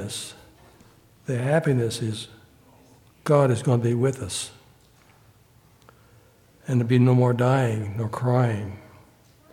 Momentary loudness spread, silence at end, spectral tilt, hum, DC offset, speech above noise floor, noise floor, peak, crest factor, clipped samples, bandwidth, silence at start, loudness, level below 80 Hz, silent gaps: 17 LU; 0.7 s; -6.5 dB/octave; none; under 0.1%; 34 dB; -56 dBFS; -6 dBFS; 20 dB; under 0.1%; 13.5 kHz; 0 s; -23 LUFS; -60 dBFS; none